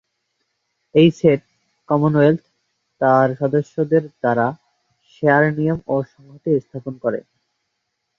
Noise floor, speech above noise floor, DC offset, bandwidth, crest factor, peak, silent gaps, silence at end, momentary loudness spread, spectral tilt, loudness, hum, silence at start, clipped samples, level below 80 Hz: -75 dBFS; 58 dB; under 0.1%; 7.4 kHz; 18 dB; -2 dBFS; none; 1 s; 10 LU; -8.5 dB/octave; -18 LUFS; none; 0.95 s; under 0.1%; -58 dBFS